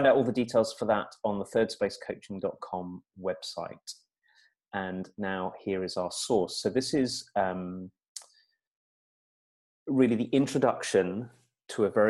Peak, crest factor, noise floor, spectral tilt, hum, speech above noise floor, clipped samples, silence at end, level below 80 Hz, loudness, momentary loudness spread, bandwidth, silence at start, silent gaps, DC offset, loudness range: -10 dBFS; 20 dB; -68 dBFS; -5 dB/octave; none; 39 dB; under 0.1%; 0 s; -68 dBFS; -30 LUFS; 17 LU; 12.5 kHz; 0 s; 8.08-8.15 s, 8.67-9.86 s; under 0.1%; 7 LU